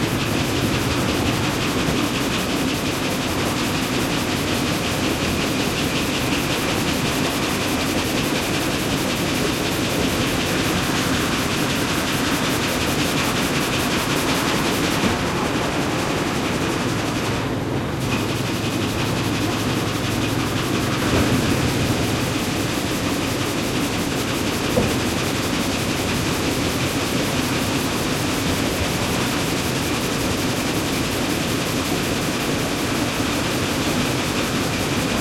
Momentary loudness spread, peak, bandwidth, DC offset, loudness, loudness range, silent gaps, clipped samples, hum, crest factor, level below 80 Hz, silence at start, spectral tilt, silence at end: 2 LU; -4 dBFS; 16.5 kHz; under 0.1%; -21 LUFS; 2 LU; none; under 0.1%; none; 16 dB; -38 dBFS; 0 s; -4 dB/octave; 0 s